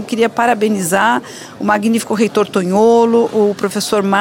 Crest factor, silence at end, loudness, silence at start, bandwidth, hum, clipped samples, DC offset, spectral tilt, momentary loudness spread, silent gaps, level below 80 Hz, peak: 12 dB; 0 s; -14 LUFS; 0 s; 16.5 kHz; none; under 0.1%; under 0.1%; -4.5 dB/octave; 6 LU; none; -58 dBFS; -2 dBFS